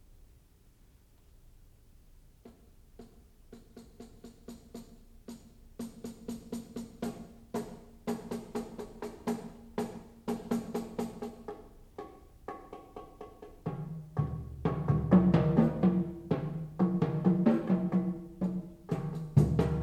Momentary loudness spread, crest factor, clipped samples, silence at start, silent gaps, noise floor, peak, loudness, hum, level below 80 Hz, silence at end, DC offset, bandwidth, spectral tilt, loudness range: 24 LU; 22 dB; under 0.1%; 2.45 s; none; -61 dBFS; -12 dBFS; -33 LUFS; none; -52 dBFS; 0 s; under 0.1%; 13.5 kHz; -8.5 dB/octave; 20 LU